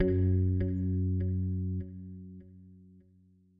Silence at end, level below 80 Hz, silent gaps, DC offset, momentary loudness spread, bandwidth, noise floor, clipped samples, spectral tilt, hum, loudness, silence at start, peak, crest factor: 0.8 s; -52 dBFS; none; under 0.1%; 19 LU; 2.4 kHz; -63 dBFS; under 0.1%; -13 dB/octave; none; -31 LUFS; 0 s; -16 dBFS; 16 dB